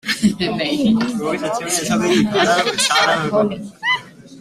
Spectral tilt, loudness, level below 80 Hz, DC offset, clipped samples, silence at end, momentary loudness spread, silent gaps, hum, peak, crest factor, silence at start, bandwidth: -3.5 dB/octave; -17 LUFS; -52 dBFS; under 0.1%; under 0.1%; 0 s; 7 LU; none; none; -2 dBFS; 16 dB; 0.05 s; 15.5 kHz